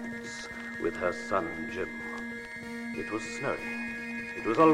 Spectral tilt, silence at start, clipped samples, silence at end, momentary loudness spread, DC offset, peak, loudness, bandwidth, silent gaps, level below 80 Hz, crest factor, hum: -5 dB/octave; 0 s; under 0.1%; 0 s; 7 LU; under 0.1%; -12 dBFS; -34 LUFS; 16 kHz; none; -60 dBFS; 20 dB; none